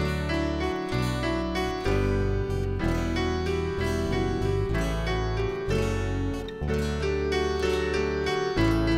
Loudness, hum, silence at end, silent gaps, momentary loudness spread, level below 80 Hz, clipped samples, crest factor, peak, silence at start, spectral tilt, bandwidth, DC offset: -27 LUFS; none; 0 s; none; 3 LU; -34 dBFS; under 0.1%; 14 dB; -12 dBFS; 0 s; -6.5 dB/octave; 15.5 kHz; under 0.1%